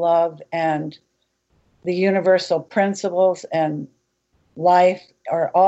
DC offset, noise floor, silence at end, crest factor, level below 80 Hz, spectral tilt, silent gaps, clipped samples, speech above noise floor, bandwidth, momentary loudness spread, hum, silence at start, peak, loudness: under 0.1%; -66 dBFS; 0 s; 16 dB; -72 dBFS; -6 dB/octave; none; under 0.1%; 48 dB; 8.2 kHz; 14 LU; none; 0 s; -4 dBFS; -20 LUFS